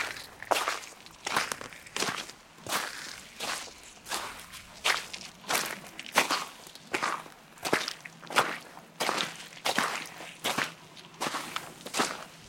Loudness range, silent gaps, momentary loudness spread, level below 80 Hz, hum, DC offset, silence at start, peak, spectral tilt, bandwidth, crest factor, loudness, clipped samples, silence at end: 3 LU; none; 15 LU; -68 dBFS; none; under 0.1%; 0 s; -6 dBFS; -1 dB/octave; 17 kHz; 28 dB; -32 LUFS; under 0.1%; 0 s